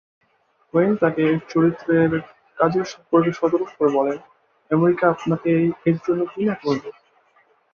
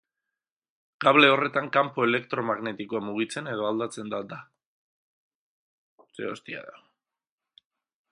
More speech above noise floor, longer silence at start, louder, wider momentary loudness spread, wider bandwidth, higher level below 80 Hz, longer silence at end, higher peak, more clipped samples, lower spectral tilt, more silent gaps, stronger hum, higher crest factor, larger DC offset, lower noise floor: second, 44 dB vs 64 dB; second, 0.75 s vs 1 s; first, -20 LUFS vs -25 LUFS; second, 7 LU vs 19 LU; second, 6.8 kHz vs 11 kHz; first, -60 dBFS vs -76 dBFS; second, 0.8 s vs 1.4 s; about the same, -2 dBFS vs -2 dBFS; neither; first, -8 dB/octave vs -5 dB/octave; second, none vs 4.66-5.98 s; neither; second, 18 dB vs 26 dB; neither; second, -63 dBFS vs -90 dBFS